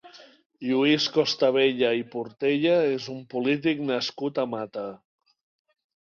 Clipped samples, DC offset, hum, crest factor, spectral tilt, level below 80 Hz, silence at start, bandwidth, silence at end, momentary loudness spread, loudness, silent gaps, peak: under 0.1%; under 0.1%; none; 16 dB; -5 dB/octave; -70 dBFS; 0.05 s; 7.2 kHz; 1.15 s; 12 LU; -25 LUFS; 0.46-0.50 s; -10 dBFS